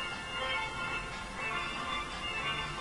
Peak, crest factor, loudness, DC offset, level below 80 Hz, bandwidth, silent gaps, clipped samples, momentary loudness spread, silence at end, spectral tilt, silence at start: -22 dBFS; 14 dB; -35 LUFS; under 0.1%; -52 dBFS; 11.5 kHz; none; under 0.1%; 3 LU; 0 s; -3 dB/octave; 0 s